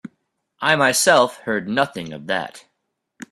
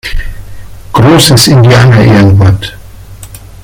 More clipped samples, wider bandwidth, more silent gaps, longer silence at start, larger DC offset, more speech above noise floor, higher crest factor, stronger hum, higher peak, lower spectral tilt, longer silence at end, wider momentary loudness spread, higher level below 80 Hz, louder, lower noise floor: second, under 0.1% vs 3%; second, 15 kHz vs over 20 kHz; neither; about the same, 0.05 s vs 0.05 s; neither; first, 56 dB vs 24 dB; first, 20 dB vs 6 dB; neither; about the same, 0 dBFS vs 0 dBFS; second, -2.5 dB/octave vs -5.5 dB/octave; first, 0.75 s vs 0.25 s; second, 11 LU vs 18 LU; second, -64 dBFS vs -22 dBFS; second, -19 LUFS vs -4 LUFS; first, -75 dBFS vs -27 dBFS